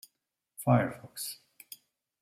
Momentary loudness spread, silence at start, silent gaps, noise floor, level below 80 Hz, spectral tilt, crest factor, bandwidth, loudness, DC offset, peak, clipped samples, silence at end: 23 LU; 0.6 s; none; -83 dBFS; -70 dBFS; -6 dB/octave; 22 dB; 16 kHz; -31 LUFS; under 0.1%; -12 dBFS; under 0.1%; 0.9 s